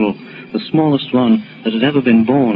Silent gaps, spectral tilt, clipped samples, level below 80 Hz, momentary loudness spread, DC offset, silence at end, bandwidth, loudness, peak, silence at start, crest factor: none; -10.5 dB/octave; under 0.1%; -56 dBFS; 12 LU; under 0.1%; 0 s; 5 kHz; -15 LUFS; 0 dBFS; 0 s; 14 dB